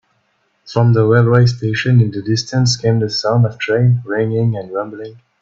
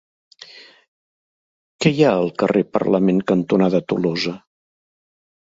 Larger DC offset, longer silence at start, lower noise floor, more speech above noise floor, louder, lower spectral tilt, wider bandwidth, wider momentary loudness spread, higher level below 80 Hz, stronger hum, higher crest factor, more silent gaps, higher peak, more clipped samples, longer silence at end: neither; about the same, 0.65 s vs 0.55 s; first, -62 dBFS vs -44 dBFS; first, 48 dB vs 26 dB; first, -15 LUFS vs -18 LUFS; about the same, -6.5 dB/octave vs -6.5 dB/octave; about the same, 7.8 kHz vs 8 kHz; about the same, 11 LU vs 10 LU; first, -50 dBFS vs -58 dBFS; neither; second, 14 dB vs 20 dB; second, none vs 0.88-1.79 s; about the same, 0 dBFS vs 0 dBFS; neither; second, 0.3 s vs 1.2 s